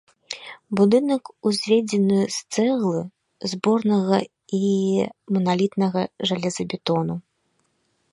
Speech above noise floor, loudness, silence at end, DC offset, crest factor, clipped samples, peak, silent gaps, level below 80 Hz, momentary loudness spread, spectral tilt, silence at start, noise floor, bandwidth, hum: 48 dB; -22 LUFS; 0.95 s; under 0.1%; 18 dB; under 0.1%; -4 dBFS; none; -66 dBFS; 11 LU; -6 dB/octave; 0.3 s; -69 dBFS; 11.5 kHz; none